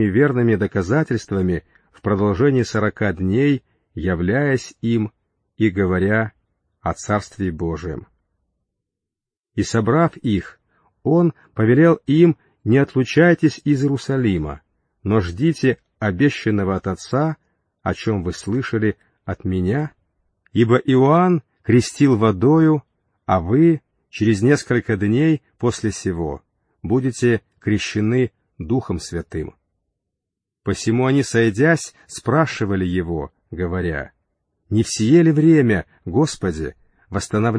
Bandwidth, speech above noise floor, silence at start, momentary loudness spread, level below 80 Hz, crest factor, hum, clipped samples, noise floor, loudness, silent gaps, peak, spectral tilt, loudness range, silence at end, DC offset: 10.5 kHz; 69 dB; 0 s; 14 LU; -44 dBFS; 16 dB; none; under 0.1%; -86 dBFS; -19 LUFS; 9.39-9.44 s; -2 dBFS; -7 dB/octave; 7 LU; 0 s; under 0.1%